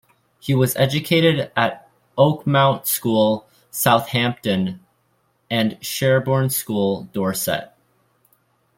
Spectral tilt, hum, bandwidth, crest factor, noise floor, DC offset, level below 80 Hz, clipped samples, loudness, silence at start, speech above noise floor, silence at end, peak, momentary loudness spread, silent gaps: -5 dB/octave; none; 16.5 kHz; 18 dB; -65 dBFS; under 0.1%; -58 dBFS; under 0.1%; -19 LUFS; 0.45 s; 46 dB; 1.15 s; -2 dBFS; 10 LU; none